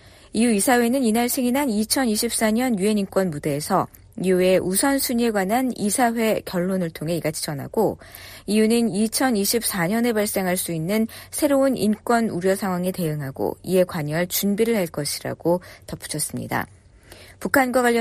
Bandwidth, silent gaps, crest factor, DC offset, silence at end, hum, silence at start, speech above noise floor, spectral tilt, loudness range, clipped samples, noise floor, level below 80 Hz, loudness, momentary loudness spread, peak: 15.5 kHz; none; 16 dB; under 0.1%; 0 s; none; 0.05 s; 25 dB; -4.5 dB/octave; 3 LU; under 0.1%; -47 dBFS; -52 dBFS; -22 LUFS; 8 LU; -4 dBFS